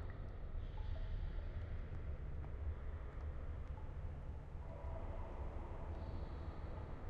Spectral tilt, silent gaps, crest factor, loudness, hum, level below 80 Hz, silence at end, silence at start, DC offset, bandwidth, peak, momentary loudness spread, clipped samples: -8.5 dB/octave; none; 12 dB; -49 LUFS; none; -48 dBFS; 0 s; 0 s; under 0.1%; 5.2 kHz; -34 dBFS; 3 LU; under 0.1%